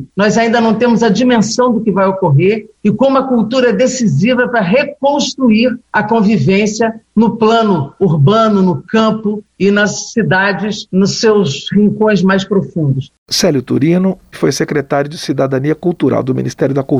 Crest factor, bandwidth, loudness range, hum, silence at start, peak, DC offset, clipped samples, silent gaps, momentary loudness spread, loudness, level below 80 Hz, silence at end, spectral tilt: 10 dB; 13.5 kHz; 2 LU; none; 0 s; -2 dBFS; under 0.1%; under 0.1%; 13.18-13.26 s; 6 LU; -12 LUFS; -48 dBFS; 0 s; -5.5 dB/octave